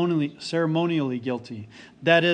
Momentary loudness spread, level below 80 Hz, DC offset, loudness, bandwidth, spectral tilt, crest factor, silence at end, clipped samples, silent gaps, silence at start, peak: 19 LU; -68 dBFS; under 0.1%; -25 LUFS; 9.6 kHz; -6.5 dB/octave; 18 dB; 0 s; under 0.1%; none; 0 s; -6 dBFS